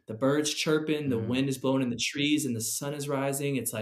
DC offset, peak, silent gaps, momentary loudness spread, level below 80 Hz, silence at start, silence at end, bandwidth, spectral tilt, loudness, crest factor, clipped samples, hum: under 0.1%; -12 dBFS; none; 4 LU; -70 dBFS; 0.1 s; 0 s; 15.5 kHz; -4 dB/octave; -28 LUFS; 16 dB; under 0.1%; none